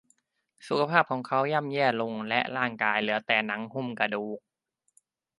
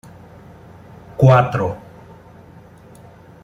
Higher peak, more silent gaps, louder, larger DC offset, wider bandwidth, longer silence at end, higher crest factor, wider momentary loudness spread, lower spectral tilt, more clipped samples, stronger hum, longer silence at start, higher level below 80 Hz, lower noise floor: about the same, -4 dBFS vs -2 dBFS; neither; second, -27 LUFS vs -15 LUFS; neither; first, 11.5 kHz vs 6.8 kHz; second, 1 s vs 1.65 s; about the same, 24 dB vs 20 dB; second, 8 LU vs 22 LU; second, -6 dB/octave vs -8.5 dB/octave; neither; neither; second, 0.6 s vs 1.2 s; second, -76 dBFS vs -48 dBFS; first, -71 dBFS vs -43 dBFS